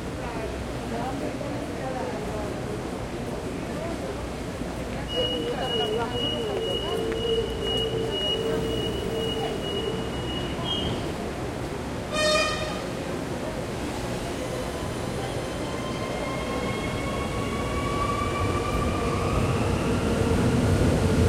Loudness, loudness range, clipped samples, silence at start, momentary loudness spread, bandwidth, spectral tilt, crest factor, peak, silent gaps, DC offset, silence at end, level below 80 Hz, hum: -28 LUFS; 5 LU; under 0.1%; 0 s; 9 LU; 16.5 kHz; -5 dB/octave; 18 dB; -10 dBFS; none; under 0.1%; 0 s; -38 dBFS; none